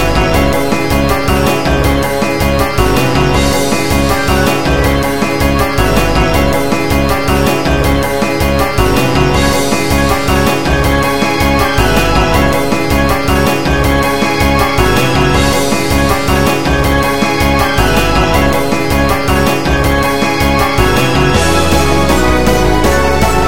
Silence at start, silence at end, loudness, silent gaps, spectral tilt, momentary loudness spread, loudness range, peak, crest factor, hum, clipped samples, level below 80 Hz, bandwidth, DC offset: 0 s; 0 s; -11 LUFS; none; -5 dB/octave; 2 LU; 1 LU; 0 dBFS; 12 dB; none; under 0.1%; -18 dBFS; 17 kHz; 7%